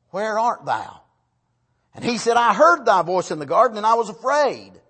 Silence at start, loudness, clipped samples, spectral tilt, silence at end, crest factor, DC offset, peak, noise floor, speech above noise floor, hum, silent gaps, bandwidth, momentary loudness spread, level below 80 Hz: 0.15 s; -19 LUFS; under 0.1%; -4 dB/octave; 0.25 s; 18 dB; under 0.1%; -2 dBFS; -69 dBFS; 50 dB; none; none; 8.8 kHz; 11 LU; -68 dBFS